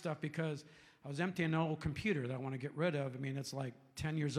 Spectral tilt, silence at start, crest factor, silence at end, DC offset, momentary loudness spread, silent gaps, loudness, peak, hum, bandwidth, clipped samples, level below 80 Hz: -6.5 dB/octave; 0 s; 16 dB; 0 s; under 0.1%; 9 LU; none; -40 LUFS; -22 dBFS; none; 13.5 kHz; under 0.1%; -64 dBFS